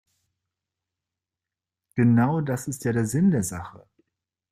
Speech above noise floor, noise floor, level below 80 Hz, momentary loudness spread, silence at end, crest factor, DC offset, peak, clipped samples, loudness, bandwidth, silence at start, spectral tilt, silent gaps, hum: 67 dB; -89 dBFS; -60 dBFS; 14 LU; 0.75 s; 18 dB; under 0.1%; -10 dBFS; under 0.1%; -24 LUFS; 15.5 kHz; 1.95 s; -7 dB/octave; none; none